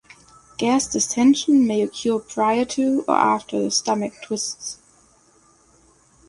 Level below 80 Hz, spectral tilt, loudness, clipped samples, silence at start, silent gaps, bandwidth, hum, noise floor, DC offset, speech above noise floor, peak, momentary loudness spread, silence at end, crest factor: -60 dBFS; -3.5 dB/octave; -20 LUFS; under 0.1%; 0.6 s; none; 11.5 kHz; none; -56 dBFS; under 0.1%; 36 dB; -4 dBFS; 10 LU; 1.55 s; 18 dB